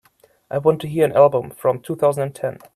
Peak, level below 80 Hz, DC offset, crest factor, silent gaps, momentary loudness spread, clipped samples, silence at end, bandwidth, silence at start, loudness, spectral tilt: 0 dBFS; -60 dBFS; under 0.1%; 18 dB; none; 11 LU; under 0.1%; 0.2 s; 14 kHz; 0.5 s; -19 LUFS; -7 dB/octave